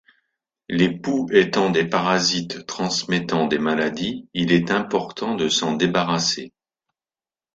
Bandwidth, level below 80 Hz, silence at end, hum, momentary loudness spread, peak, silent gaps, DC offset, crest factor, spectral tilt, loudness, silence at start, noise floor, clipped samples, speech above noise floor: 9 kHz; -58 dBFS; 1.05 s; none; 8 LU; -2 dBFS; none; under 0.1%; 20 dB; -4 dB/octave; -21 LUFS; 0.7 s; under -90 dBFS; under 0.1%; over 69 dB